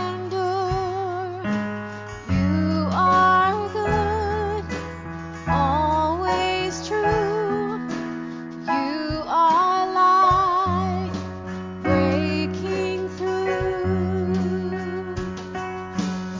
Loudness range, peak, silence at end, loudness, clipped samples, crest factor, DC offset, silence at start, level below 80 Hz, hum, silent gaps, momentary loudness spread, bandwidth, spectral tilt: 4 LU; -8 dBFS; 0 s; -23 LUFS; under 0.1%; 16 dB; under 0.1%; 0 s; -38 dBFS; none; none; 13 LU; 7.6 kHz; -6.5 dB/octave